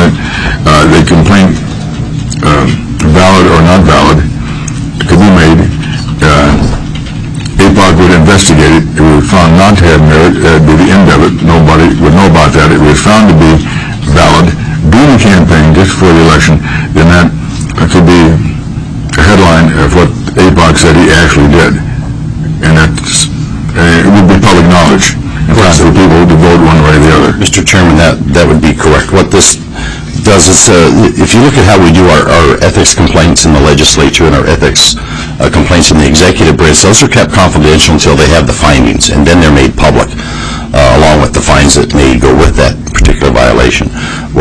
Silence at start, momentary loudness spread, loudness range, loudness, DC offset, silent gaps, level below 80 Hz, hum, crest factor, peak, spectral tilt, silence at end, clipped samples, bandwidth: 0 s; 10 LU; 3 LU; -4 LUFS; 2%; none; -16 dBFS; none; 4 dB; 0 dBFS; -5 dB/octave; 0 s; 5%; 11 kHz